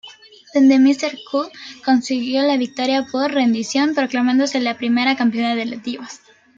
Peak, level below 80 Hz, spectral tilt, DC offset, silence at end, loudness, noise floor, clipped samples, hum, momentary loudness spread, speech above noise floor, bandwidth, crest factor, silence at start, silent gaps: -4 dBFS; -68 dBFS; -3.5 dB/octave; under 0.1%; 0.4 s; -18 LUFS; -43 dBFS; under 0.1%; none; 12 LU; 25 dB; 7.8 kHz; 14 dB; 0.05 s; none